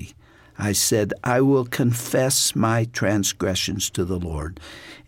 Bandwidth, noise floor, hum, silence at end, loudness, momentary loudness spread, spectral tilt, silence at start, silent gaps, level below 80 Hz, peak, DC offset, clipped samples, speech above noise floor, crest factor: 17 kHz; -50 dBFS; none; 0.1 s; -21 LUFS; 13 LU; -4 dB/octave; 0 s; none; -44 dBFS; -6 dBFS; under 0.1%; under 0.1%; 28 dB; 16 dB